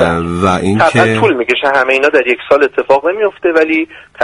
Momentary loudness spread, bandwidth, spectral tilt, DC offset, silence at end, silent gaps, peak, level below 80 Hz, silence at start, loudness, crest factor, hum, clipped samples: 4 LU; 11.5 kHz; -6 dB/octave; under 0.1%; 0 s; none; 0 dBFS; -42 dBFS; 0 s; -11 LUFS; 12 dB; none; under 0.1%